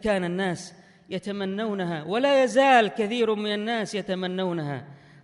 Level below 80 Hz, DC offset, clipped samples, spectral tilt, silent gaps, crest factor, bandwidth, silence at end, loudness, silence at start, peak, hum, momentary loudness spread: -60 dBFS; under 0.1%; under 0.1%; -5 dB/octave; none; 18 dB; 11.5 kHz; 0.3 s; -25 LUFS; 0 s; -6 dBFS; none; 15 LU